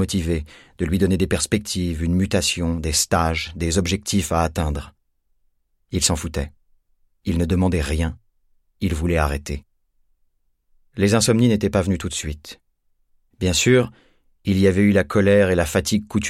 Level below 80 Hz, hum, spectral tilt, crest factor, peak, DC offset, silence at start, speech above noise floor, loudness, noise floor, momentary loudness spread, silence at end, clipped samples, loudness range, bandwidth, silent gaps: -34 dBFS; none; -5 dB/octave; 18 dB; -4 dBFS; under 0.1%; 0 s; 46 dB; -20 LUFS; -66 dBFS; 13 LU; 0 s; under 0.1%; 6 LU; 15.5 kHz; none